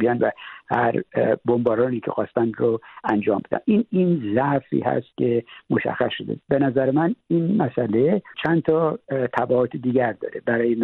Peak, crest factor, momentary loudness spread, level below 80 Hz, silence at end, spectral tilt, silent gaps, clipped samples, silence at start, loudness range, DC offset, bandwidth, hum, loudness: -6 dBFS; 16 dB; 5 LU; -60 dBFS; 0 s; -10 dB/octave; none; under 0.1%; 0 s; 1 LU; under 0.1%; 4.3 kHz; none; -22 LUFS